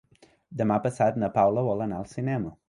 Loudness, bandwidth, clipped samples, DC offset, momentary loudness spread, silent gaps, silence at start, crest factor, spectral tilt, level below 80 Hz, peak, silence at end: -26 LUFS; 11 kHz; under 0.1%; under 0.1%; 9 LU; none; 0.5 s; 18 dB; -8.5 dB/octave; -58 dBFS; -10 dBFS; 0.15 s